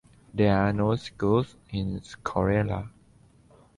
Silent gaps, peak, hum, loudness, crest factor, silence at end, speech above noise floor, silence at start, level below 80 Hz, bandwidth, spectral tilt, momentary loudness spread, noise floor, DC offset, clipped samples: none; -10 dBFS; none; -27 LUFS; 18 dB; 0.9 s; 32 dB; 0.35 s; -46 dBFS; 11 kHz; -8 dB/octave; 12 LU; -58 dBFS; under 0.1%; under 0.1%